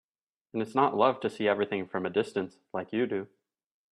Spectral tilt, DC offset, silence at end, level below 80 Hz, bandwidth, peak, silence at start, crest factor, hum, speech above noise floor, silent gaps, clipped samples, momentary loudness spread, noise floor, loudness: -6.5 dB/octave; under 0.1%; 0.65 s; -74 dBFS; 11 kHz; -10 dBFS; 0.55 s; 20 dB; none; 55 dB; none; under 0.1%; 12 LU; -84 dBFS; -30 LUFS